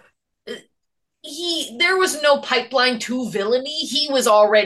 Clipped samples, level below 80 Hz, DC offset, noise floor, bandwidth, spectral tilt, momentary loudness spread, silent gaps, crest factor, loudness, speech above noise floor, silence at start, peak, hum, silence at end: under 0.1%; -72 dBFS; under 0.1%; -79 dBFS; 12.5 kHz; -2 dB/octave; 19 LU; none; 16 dB; -18 LUFS; 61 dB; 0.45 s; -4 dBFS; none; 0 s